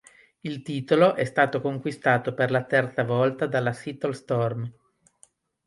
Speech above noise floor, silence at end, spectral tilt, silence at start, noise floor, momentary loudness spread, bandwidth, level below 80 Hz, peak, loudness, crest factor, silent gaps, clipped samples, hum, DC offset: 36 dB; 0.95 s; -7 dB/octave; 0.45 s; -61 dBFS; 13 LU; 11.5 kHz; -68 dBFS; -6 dBFS; -25 LUFS; 20 dB; none; under 0.1%; none; under 0.1%